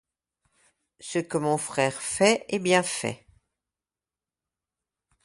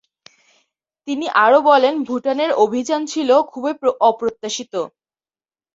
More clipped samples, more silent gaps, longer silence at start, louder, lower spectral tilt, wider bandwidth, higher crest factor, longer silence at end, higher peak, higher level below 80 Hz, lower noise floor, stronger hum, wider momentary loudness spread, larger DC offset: neither; neither; about the same, 1 s vs 1.05 s; second, -25 LUFS vs -17 LUFS; about the same, -3.5 dB/octave vs -3 dB/octave; first, 11.5 kHz vs 7.8 kHz; first, 24 dB vs 16 dB; first, 2.1 s vs 0.85 s; second, -6 dBFS vs -2 dBFS; about the same, -66 dBFS vs -66 dBFS; about the same, under -90 dBFS vs under -90 dBFS; neither; second, 11 LU vs 14 LU; neither